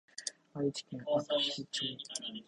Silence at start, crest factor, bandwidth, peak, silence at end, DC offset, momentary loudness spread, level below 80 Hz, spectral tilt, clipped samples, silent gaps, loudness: 0.2 s; 18 dB; 11.5 kHz; -18 dBFS; 0.05 s; under 0.1%; 10 LU; -78 dBFS; -3.5 dB/octave; under 0.1%; none; -36 LUFS